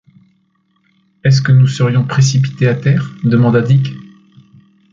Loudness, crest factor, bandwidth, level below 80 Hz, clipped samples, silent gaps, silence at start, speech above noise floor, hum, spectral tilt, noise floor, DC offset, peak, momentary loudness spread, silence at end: -13 LUFS; 12 dB; 7.6 kHz; -48 dBFS; under 0.1%; none; 1.25 s; 48 dB; none; -6.5 dB/octave; -60 dBFS; under 0.1%; -2 dBFS; 5 LU; 0.85 s